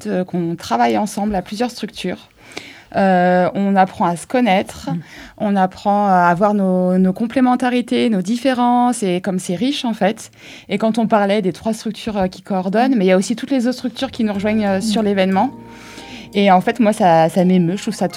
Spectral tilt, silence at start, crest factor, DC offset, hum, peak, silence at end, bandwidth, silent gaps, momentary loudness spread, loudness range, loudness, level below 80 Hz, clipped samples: -6 dB/octave; 0 s; 16 dB; under 0.1%; none; 0 dBFS; 0 s; 14.5 kHz; none; 12 LU; 3 LU; -17 LUFS; -50 dBFS; under 0.1%